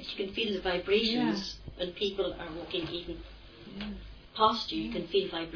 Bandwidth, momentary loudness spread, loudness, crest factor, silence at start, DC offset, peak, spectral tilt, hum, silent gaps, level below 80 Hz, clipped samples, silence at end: 5.4 kHz; 17 LU; -32 LUFS; 20 dB; 0 s; under 0.1%; -12 dBFS; -5 dB/octave; none; none; -52 dBFS; under 0.1%; 0 s